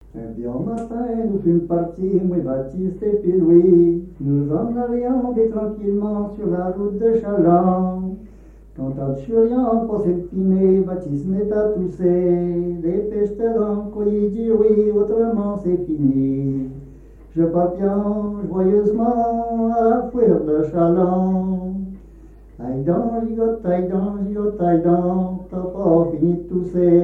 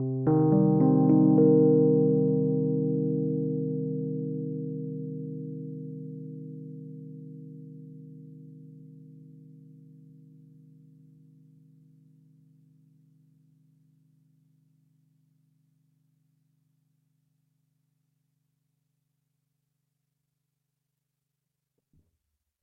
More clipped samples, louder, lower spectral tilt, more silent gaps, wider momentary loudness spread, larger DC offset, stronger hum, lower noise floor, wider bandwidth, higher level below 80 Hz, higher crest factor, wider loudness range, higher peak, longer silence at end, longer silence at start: neither; first, -19 LUFS vs -25 LUFS; second, -12 dB/octave vs -15 dB/octave; neither; second, 10 LU vs 26 LU; neither; neither; second, -42 dBFS vs -84 dBFS; first, 2.5 kHz vs 1.9 kHz; first, -42 dBFS vs -74 dBFS; about the same, 16 dB vs 20 dB; second, 3 LU vs 26 LU; first, -2 dBFS vs -10 dBFS; second, 0 s vs 13.2 s; first, 0.15 s vs 0 s